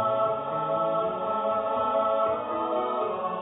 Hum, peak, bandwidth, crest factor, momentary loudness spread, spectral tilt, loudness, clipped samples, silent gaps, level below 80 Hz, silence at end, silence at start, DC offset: none; -14 dBFS; 4 kHz; 14 dB; 4 LU; -10 dB/octave; -27 LUFS; under 0.1%; none; -64 dBFS; 0 s; 0 s; under 0.1%